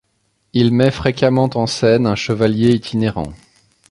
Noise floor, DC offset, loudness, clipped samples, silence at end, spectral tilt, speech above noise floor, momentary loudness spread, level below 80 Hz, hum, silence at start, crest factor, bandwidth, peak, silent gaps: -65 dBFS; under 0.1%; -16 LUFS; under 0.1%; 0.55 s; -6.5 dB/octave; 50 dB; 7 LU; -42 dBFS; none; 0.55 s; 16 dB; 11.5 kHz; -2 dBFS; none